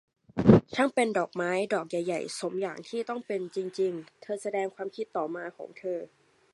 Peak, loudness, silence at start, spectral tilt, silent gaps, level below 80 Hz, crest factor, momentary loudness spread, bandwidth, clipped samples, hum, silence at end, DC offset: -2 dBFS; -29 LUFS; 0.35 s; -6.5 dB/octave; none; -56 dBFS; 26 dB; 16 LU; 11.5 kHz; under 0.1%; none; 0.45 s; under 0.1%